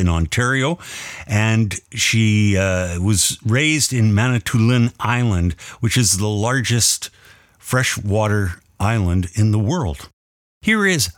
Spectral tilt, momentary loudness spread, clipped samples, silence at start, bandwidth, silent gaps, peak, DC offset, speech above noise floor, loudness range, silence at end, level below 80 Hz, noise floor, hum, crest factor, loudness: -4.5 dB/octave; 8 LU; under 0.1%; 0 s; 17 kHz; 10.13-10.61 s; -4 dBFS; under 0.1%; 29 dB; 3 LU; 0.05 s; -38 dBFS; -47 dBFS; none; 14 dB; -18 LUFS